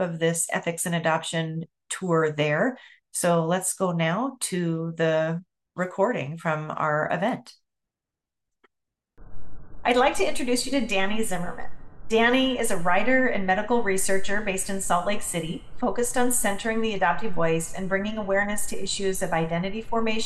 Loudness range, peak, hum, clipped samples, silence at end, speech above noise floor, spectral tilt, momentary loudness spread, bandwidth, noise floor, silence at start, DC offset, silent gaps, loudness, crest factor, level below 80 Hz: 5 LU; -8 dBFS; none; under 0.1%; 0 s; 63 dB; -4 dB/octave; 8 LU; 12.5 kHz; -87 dBFS; 0 s; under 0.1%; none; -25 LUFS; 16 dB; -48 dBFS